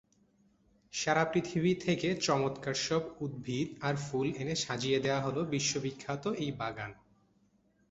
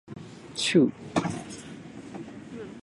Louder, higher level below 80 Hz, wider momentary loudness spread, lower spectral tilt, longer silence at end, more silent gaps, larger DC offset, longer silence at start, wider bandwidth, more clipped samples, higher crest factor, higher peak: second, -33 LUFS vs -26 LUFS; about the same, -66 dBFS vs -62 dBFS; second, 8 LU vs 20 LU; about the same, -4.5 dB/octave vs -5 dB/octave; first, 0.95 s vs 0 s; neither; neither; first, 0.95 s vs 0.05 s; second, 8 kHz vs 11.5 kHz; neither; about the same, 20 dB vs 20 dB; second, -14 dBFS vs -8 dBFS